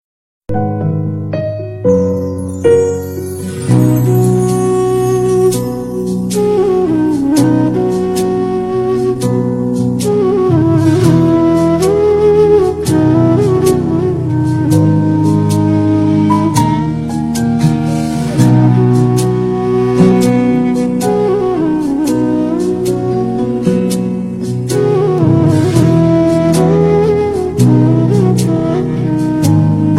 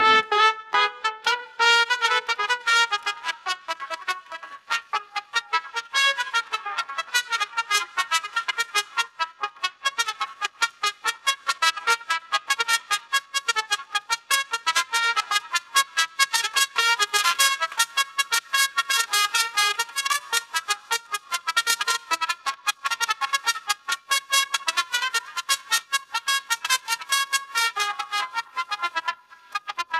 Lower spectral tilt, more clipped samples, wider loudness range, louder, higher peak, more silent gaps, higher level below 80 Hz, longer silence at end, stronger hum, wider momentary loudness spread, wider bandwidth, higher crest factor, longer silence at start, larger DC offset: first, -7.5 dB/octave vs 3 dB/octave; neither; about the same, 3 LU vs 5 LU; first, -12 LUFS vs -23 LUFS; first, 0 dBFS vs -4 dBFS; neither; first, -38 dBFS vs -76 dBFS; about the same, 0 s vs 0 s; neither; about the same, 7 LU vs 9 LU; second, 14 kHz vs 16 kHz; second, 12 dB vs 20 dB; first, 0.5 s vs 0 s; neither